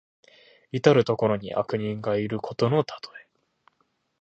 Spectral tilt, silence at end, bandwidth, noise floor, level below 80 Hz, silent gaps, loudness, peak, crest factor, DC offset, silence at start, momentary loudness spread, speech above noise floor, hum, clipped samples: -7 dB/octave; 1 s; 8 kHz; -72 dBFS; -62 dBFS; none; -25 LUFS; -2 dBFS; 24 dB; under 0.1%; 0.75 s; 14 LU; 47 dB; none; under 0.1%